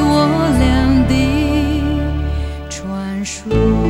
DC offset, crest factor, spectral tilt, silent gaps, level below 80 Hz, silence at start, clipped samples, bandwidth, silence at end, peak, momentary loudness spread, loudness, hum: under 0.1%; 12 dB; -6.5 dB/octave; none; -22 dBFS; 0 s; under 0.1%; 13.5 kHz; 0 s; -2 dBFS; 10 LU; -16 LUFS; none